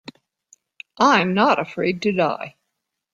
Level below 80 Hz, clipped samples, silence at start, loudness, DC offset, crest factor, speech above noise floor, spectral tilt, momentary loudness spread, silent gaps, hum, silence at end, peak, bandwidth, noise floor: -64 dBFS; under 0.1%; 1 s; -19 LUFS; under 0.1%; 20 dB; 60 dB; -5 dB/octave; 10 LU; none; none; 0.65 s; -2 dBFS; 7.8 kHz; -79 dBFS